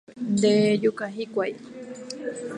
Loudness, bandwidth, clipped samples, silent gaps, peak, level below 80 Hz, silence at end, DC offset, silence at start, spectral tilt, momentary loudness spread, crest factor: -24 LUFS; 11 kHz; under 0.1%; none; -8 dBFS; -68 dBFS; 0 s; under 0.1%; 0.1 s; -5.5 dB/octave; 19 LU; 16 dB